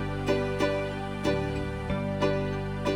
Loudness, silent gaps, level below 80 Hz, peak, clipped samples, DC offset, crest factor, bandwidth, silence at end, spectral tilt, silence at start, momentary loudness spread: -29 LUFS; none; -42 dBFS; -12 dBFS; under 0.1%; 0.1%; 16 dB; 15.5 kHz; 0 s; -6.5 dB/octave; 0 s; 4 LU